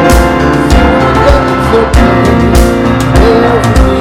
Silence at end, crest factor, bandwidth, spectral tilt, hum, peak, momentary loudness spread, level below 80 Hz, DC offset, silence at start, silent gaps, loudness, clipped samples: 0 s; 6 dB; 16 kHz; -6.5 dB/octave; none; 0 dBFS; 2 LU; -12 dBFS; under 0.1%; 0 s; none; -7 LUFS; 8%